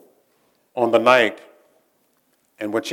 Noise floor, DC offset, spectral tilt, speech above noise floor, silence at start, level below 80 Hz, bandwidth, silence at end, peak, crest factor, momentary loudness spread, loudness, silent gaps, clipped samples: -65 dBFS; under 0.1%; -4 dB/octave; 47 dB; 0.75 s; -74 dBFS; 16.5 kHz; 0 s; 0 dBFS; 22 dB; 17 LU; -18 LUFS; none; under 0.1%